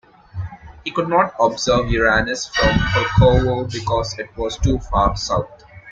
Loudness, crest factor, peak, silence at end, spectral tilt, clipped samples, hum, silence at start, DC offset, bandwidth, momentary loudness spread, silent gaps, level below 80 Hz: -18 LUFS; 16 dB; -2 dBFS; 0 s; -5 dB/octave; under 0.1%; none; 0.35 s; under 0.1%; 7.8 kHz; 17 LU; none; -30 dBFS